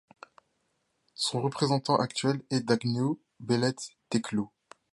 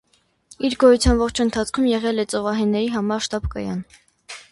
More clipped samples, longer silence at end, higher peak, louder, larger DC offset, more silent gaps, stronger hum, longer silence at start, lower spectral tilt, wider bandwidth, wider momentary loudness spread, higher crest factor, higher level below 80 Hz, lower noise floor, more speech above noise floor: neither; first, 0.45 s vs 0.1 s; second, -10 dBFS vs -4 dBFS; second, -29 LUFS vs -20 LUFS; neither; neither; neither; first, 1.2 s vs 0.6 s; about the same, -5 dB/octave vs -5 dB/octave; about the same, 11.5 kHz vs 11.5 kHz; second, 9 LU vs 13 LU; about the same, 20 dB vs 18 dB; second, -70 dBFS vs -34 dBFS; first, -76 dBFS vs -53 dBFS; first, 48 dB vs 33 dB